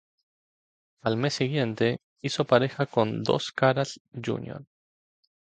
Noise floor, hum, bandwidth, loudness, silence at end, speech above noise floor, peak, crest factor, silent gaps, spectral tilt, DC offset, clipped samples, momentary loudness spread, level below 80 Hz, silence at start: under -90 dBFS; none; 9.2 kHz; -27 LUFS; 0.95 s; over 64 dB; -6 dBFS; 22 dB; 2.04-2.16 s, 4.00-4.05 s; -5.5 dB/octave; under 0.1%; under 0.1%; 11 LU; -66 dBFS; 1.05 s